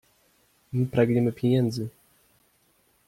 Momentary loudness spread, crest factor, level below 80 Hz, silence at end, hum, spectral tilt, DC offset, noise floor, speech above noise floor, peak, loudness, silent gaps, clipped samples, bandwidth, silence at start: 11 LU; 20 dB; -60 dBFS; 1.2 s; none; -8 dB/octave; under 0.1%; -66 dBFS; 42 dB; -8 dBFS; -25 LUFS; none; under 0.1%; 15.5 kHz; 0.75 s